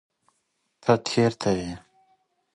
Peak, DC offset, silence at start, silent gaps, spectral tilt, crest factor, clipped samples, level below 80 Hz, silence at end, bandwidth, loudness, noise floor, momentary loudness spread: -6 dBFS; under 0.1%; 0.85 s; none; -5.5 dB/octave; 22 dB; under 0.1%; -56 dBFS; 0.75 s; 11.5 kHz; -24 LUFS; -75 dBFS; 14 LU